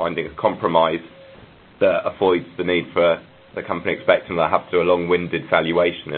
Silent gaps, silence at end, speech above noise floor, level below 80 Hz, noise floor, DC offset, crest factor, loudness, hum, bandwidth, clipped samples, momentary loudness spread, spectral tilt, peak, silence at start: none; 0 s; 26 dB; -50 dBFS; -46 dBFS; under 0.1%; 20 dB; -20 LUFS; none; 4.4 kHz; under 0.1%; 7 LU; -10 dB/octave; 0 dBFS; 0 s